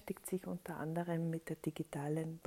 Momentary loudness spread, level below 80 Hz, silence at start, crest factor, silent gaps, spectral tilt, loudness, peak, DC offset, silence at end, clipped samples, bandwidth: 5 LU; -72 dBFS; 0 s; 16 dB; none; -7 dB/octave; -42 LUFS; -26 dBFS; under 0.1%; 0.05 s; under 0.1%; 16 kHz